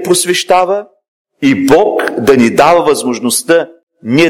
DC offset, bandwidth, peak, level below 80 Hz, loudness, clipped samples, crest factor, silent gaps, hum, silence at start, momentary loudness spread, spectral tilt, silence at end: under 0.1%; 17.5 kHz; 0 dBFS; -44 dBFS; -10 LUFS; 0.2%; 10 dB; 1.08-1.25 s, 3.83-3.87 s; none; 0 s; 7 LU; -4 dB/octave; 0 s